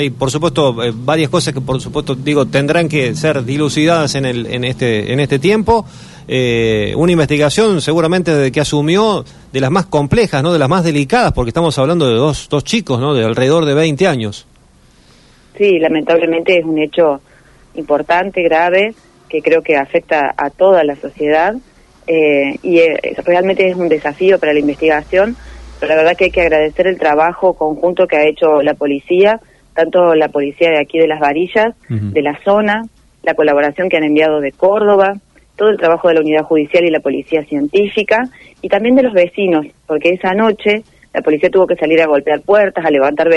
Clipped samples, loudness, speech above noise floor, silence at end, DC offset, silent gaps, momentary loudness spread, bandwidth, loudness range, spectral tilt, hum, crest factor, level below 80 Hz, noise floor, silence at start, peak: under 0.1%; -13 LUFS; 34 dB; 0 s; under 0.1%; none; 7 LU; 11.5 kHz; 2 LU; -6 dB/octave; none; 12 dB; -40 dBFS; -46 dBFS; 0 s; 0 dBFS